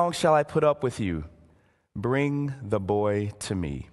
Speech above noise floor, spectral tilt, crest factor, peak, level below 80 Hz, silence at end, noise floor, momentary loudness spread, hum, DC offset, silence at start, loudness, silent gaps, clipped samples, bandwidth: 36 dB; -6 dB/octave; 18 dB; -8 dBFS; -48 dBFS; 0.05 s; -62 dBFS; 11 LU; none; under 0.1%; 0 s; -26 LUFS; none; under 0.1%; 12.5 kHz